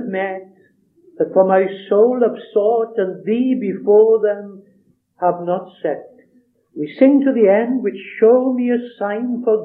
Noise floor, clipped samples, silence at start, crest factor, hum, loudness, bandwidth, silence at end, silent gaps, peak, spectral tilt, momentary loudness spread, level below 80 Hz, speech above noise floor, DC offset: -57 dBFS; under 0.1%; 0 s; 16 dB; none; -16 LUFS; 4.1 kHz; 0 s; none; 0 dBFS; -10.5 dB/octave; 12 LU; -82 dBFS; 41 dB; under 0.1%